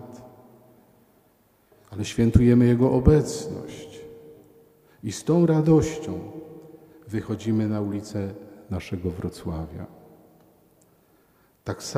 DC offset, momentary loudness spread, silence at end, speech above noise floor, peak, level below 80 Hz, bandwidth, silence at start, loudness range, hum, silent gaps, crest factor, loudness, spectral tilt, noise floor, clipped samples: under 0.1%; 24 LU; 0 s; 39 dB; -2 dBFS; -40 dBFS; 15.5 kHz; 0 s; 12 LU; none; none; 24 dB; -23 LUFS; -7.5 dB/octave; -62 dBFS; under 0.1%